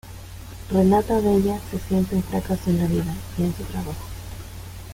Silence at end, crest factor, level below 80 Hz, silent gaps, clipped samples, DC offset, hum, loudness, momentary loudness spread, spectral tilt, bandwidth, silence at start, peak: 0 s; 16 dB; -38 dBFS; none; under 0.1%; under 0.1%; none; -23 LUFS; 19 LU; -7.5 dB/octave; 16.5 kHz; 0.05 s; -6 dBFS